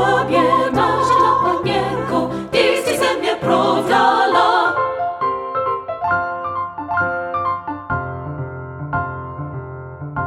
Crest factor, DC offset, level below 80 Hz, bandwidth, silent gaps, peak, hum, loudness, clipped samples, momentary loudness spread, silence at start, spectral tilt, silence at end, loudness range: 16 dB; under 0.1%; -48 dBFS; 16 kHz; none; -2 dBFS; none; -18 LUFS; under 0.1%; 14 LU; 0 s; -5 dB/octave; 0 s; 7 LU